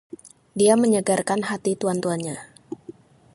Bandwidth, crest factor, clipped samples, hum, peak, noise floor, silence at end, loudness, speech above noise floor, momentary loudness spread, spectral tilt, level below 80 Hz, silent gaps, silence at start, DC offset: 11.5 kHz; 20 dB; under 0.1%; none; -4 dBFS; -45 dBFS; 0.45 s; -22 LUFS; 24 dB; 21 LU; -5 dB/octave; -66 dBFS; none; 0.55 s; under 0.1%